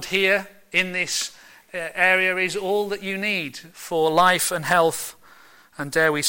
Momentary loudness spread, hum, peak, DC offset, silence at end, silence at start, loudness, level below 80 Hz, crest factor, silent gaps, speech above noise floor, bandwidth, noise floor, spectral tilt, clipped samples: 14 LU; none; -6 dBFS; under 0.1%; 0 s; 0 s; -21 LUFS; -60 dBFS; 18 dB; none; 29 dB; 17 kHz; -51 dBFS; -2.5 dB/octave; under 0.1%